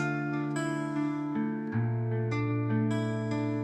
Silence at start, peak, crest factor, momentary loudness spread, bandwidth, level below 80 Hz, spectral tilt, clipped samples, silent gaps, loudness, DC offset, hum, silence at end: 0 s; -18 dBFS; 12 dB; 3 LU; 8.8 kHz; -66 dBFS; -7.5 dB/octave; under 0.1%; none; -31 LUFS; under 0.1%; none; 0 s